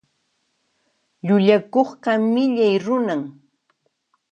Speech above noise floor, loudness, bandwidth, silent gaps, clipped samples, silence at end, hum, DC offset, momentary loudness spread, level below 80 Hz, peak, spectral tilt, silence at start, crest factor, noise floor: 52 dB; -19 LUFS; 8 kHz; none; under 0.1%; 1 s; none; under 0.1%; 11 LU; -72 dBFS; -4 dBFS; -7.5 dB/octave; 1.25 s; 18 dB; -70 dBFS